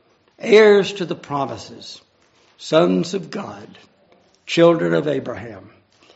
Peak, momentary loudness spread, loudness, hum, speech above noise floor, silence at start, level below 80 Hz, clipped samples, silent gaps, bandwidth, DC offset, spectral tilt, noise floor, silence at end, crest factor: 0 dBFS; 23 LU; -17 LUFS; none; 39 dB; 0.4 s; -64 dBFS; under 0.1%; none; 8 kHz; under 0.1%; -4.5 dB/octave; -57 dBFS; 0.55 s; 18 dB